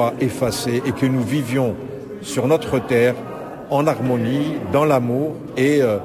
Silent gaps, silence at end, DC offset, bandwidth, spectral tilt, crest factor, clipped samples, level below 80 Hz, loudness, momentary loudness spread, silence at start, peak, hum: none; 0 s; under 0.1%; 16 kHz; -6.5 dB/octave; 14 dB; under 0.1%; -48 dBFS; -20 LUFS; 10 LU; 0 s; -6 dBFS; none